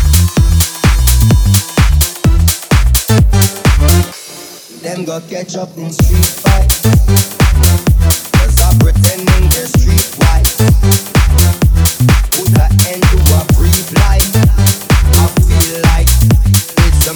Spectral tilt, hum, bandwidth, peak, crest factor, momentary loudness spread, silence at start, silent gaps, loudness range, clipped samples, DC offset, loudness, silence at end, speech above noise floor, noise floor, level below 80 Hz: -4.5 dB/octave; none; over 20 kHz; 0 dBFS; 8 dB; 7 LU; 0 s; none; 3 LU; under 0.1%; under 0.1%; -10 LUFS; 0 s; 20 dB; -31 dBFS; -12 dBFS